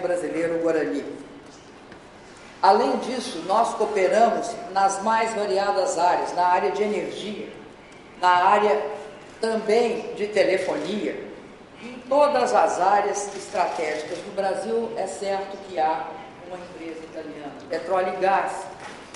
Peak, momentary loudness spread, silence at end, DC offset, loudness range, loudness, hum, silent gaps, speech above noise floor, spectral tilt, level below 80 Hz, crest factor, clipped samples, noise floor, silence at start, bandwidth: -4 dBFS; 19 LU; 0 s; under 0.1%; 6 LU; -23 LUFS; none; none; 22 dB; -3.5 dB/octave; -62 dBFS; 20 dB; under 0.1%; -45 dBFS; 0 s; 11.5 kHz